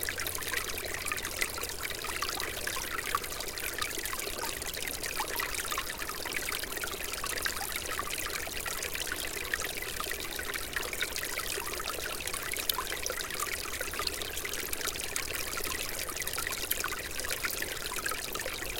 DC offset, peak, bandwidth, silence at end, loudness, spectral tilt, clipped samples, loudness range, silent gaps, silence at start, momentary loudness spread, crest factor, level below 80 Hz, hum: under 0.1%; -6 dBFS; 17 kHz; 0 s; -33 LUFS; -1 dB/octave; under 0.1%; 1 LU; none; 0 s; 3 LU; 30 dB; -50 dBFS; none